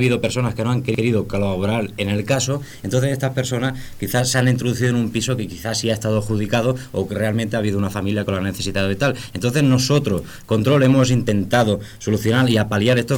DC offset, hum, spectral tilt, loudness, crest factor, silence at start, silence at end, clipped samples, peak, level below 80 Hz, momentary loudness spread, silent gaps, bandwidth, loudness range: under 0.1%; none; -5.5 dB/octave; -20 LUFS; 16 dB; 0 s; 0 s; under 0.1%; -4 dBFS; -44 dBFS; 7 LU; none; 18 kHz; 4 LU